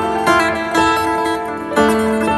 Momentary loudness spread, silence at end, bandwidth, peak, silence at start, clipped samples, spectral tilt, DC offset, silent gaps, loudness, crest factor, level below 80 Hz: 6 LU; 0 s; 15 kHz; 0 dBFS; 0 s; under 0.1%; -4.5 dB/octave; under 0.1%; none; -15 LUFS; 16 dB; -40 dBFS